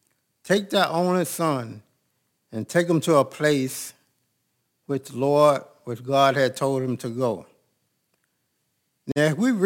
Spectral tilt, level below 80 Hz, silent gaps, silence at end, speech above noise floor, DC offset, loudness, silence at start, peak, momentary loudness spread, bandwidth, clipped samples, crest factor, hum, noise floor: -5.5 dB/octave; -70 dBFS; none; 0 s; 51 dB; under 0.1%; -23 LUFS; 0.45 s; -4 dBFS; 16 LU; 17 kHz; under 0.1%; 20 dB; none; -74 dBFS